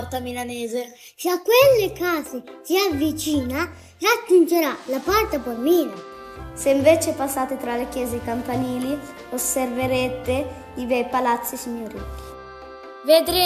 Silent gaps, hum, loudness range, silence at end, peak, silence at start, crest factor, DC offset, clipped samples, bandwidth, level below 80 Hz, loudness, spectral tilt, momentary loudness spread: none; none; 5 LU; 0 s; -4 dBFS; 0 s; 18 dB; under 0.1%; under 0.1%; 15 kHz; -46 dBFS; -22 LUFS; -4 dB/octave; 18 LU